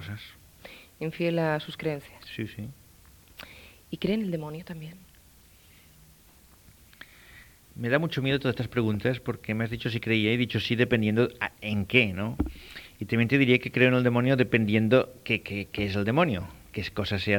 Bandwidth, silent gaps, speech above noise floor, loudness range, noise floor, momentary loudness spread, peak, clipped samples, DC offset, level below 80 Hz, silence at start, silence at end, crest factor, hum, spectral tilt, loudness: 19 kHz; none; 30 dB; 12 LU; -56 dBFS; 20 LU; -4 dBFS; under 0.1%; under 0.1%; -52 dBFS; 0 s; 0 s; 24 dB; none; -7 dB/octave; -27 LUFS